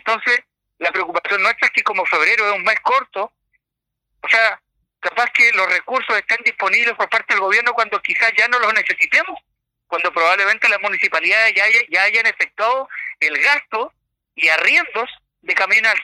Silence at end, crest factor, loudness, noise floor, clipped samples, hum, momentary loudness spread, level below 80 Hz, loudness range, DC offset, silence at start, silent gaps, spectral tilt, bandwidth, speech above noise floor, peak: 0 s; 16 dB; -15 LUFS; -81 dBFS; under 0.1%; none; 12 LU; -70 dBFS; 3 LU; under 0.1%; 0.05 s; none; -0.5 dB/octave; 15 kHz; 64 dB; -2 dBFS